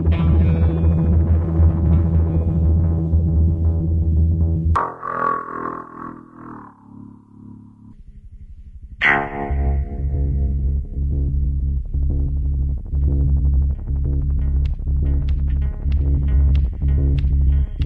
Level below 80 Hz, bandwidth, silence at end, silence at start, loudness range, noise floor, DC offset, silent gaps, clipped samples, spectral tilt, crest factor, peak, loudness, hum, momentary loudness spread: -22 dBFS; 3.7 kHz; 0 s; 0 s; 8 LU; -42 dBFS; under 0.1%; none; under 0.1%; -9.5 dB/octave; 16 dB; -2 dBFS; -20 LUFS; none; 8 LU